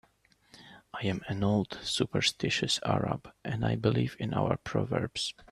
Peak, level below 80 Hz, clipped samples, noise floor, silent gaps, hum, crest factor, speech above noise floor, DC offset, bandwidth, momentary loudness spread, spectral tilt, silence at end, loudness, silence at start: -10 dBFS; -58 dBFS; under 0.1%; -66 dBFS; none; none; 22 dB; 36 dB; under 0.1%; 13 kHz; 7 LU; -5 dB/octave; 0.1 s; -31 LUFS; 0.55 s